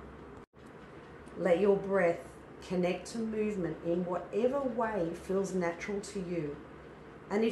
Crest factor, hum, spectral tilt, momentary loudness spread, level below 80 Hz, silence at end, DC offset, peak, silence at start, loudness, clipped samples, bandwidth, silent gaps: 18 dB; none; -6.5 dB/octave; 22 LU; -60 dBFS; 0 s; under 0.1%; -16 dBFS; 0 s; -33 LUFS; under 0.1%; 12 kHz; 0.47-0.53 s